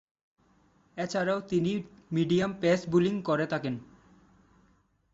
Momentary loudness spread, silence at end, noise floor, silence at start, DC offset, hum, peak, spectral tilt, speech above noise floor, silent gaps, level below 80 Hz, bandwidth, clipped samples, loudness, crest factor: 11 LU; 1.3 s; -67 dBFS; 0.95 s; under 0.1%; none; -12 dBFS; -6.5 dB/octave; 39 dB; none; -64 dBFS; 8 kHz; under 0.1%; -29 LUFS; 18 dB